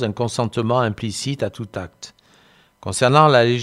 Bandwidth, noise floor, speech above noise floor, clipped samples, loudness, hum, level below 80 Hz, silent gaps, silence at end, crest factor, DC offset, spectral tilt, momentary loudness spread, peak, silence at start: 13 kHz; -54 dBFS; 35 dB; under 0.1%; -18 LUFS; none; -56 dBFS; none; 0 s; 20 dB; under 0.1%; -5 dB/octave; 21 LU; 0 dBFS; 0 s